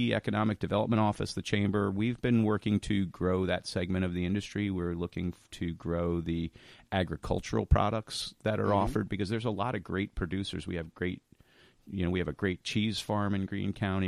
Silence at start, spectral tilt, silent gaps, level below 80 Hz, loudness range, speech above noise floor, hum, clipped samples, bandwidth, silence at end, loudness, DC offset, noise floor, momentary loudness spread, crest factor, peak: 0 s; -6.5 dB/octave; none; -46 dBFS; 5 LU; 31 dB; none; under 0.1%; 13 kHz; 0 s; -32 LUFS; under 0.1%; -62 dBFS; 8 LU; 20 dB; -10 dBFS